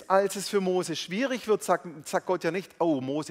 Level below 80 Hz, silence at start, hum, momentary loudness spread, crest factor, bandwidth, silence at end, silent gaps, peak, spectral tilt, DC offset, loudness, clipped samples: -74 dBFS; 0 s; none; 6 LU; 20 dB; 16 kHz; 0 s; none; -8 dBFS; -4.5 dB/octave; under 0.1%; -28 LUFS; under 0.1%